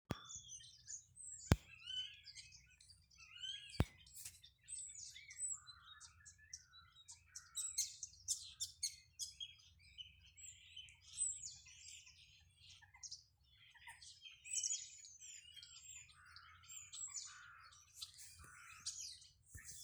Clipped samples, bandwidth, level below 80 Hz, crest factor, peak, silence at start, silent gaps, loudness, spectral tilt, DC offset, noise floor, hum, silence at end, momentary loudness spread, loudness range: under 0.1%; over 20 kHz; -60 dBFS; 38 dB; -12 dBFS; 0.1 s; none; -48 LUFS; -2.5 dB/octave; under 0.1%; -70 dBFS; none; 0 s; 20 LU; 6 LU